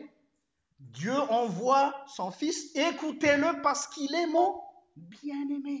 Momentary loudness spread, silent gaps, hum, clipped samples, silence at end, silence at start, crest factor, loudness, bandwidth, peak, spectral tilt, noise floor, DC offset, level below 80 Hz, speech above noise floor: 12 LU; none; none; under 0.1%; 0 s; 0 s; 18 dB; -29 LUFS; 8 kHz; -12 dBFS; -4 dB/octave; -78 dBFS; under 0.1%; -72 dBFS; 49 dB